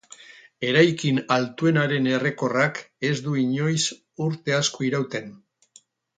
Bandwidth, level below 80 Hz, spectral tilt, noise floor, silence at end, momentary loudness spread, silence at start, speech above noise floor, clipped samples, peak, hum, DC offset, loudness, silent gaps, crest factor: 9.4 kHz; -66 dBFS; -5 dB/octave; -57 dBFS; 0.8 s; 10 LU; 0.2 s; 34 dB; under 0.1%; -4 dBFS; none; under 0.1%; -23 LUFS; none; 20 dB